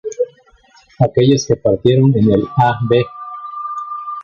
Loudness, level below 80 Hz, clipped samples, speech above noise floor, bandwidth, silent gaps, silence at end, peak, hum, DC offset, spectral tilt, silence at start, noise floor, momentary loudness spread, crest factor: -15 LUFS; -44 dBFS; under 0.1%; 37 dB; 7.2 kHz; none; 0 s; -2 dBFS; none; under 0.1%; -7 dB/octave; 0.05 s; -49 dBFS; 13 LU; 14 dB